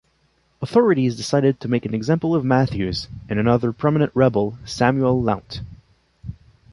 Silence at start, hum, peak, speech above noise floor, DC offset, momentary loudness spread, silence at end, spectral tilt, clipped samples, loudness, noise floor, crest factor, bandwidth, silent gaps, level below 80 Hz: 0.6 s; none; -2 dBFS; 44 dB; under 0.1%; 17 LU; 0.4 s; -7 dB/octave; under 0.1%; -20 LUFS; -63 dBFS; 18 dB; 11.5 kHz; none; -46 dBFS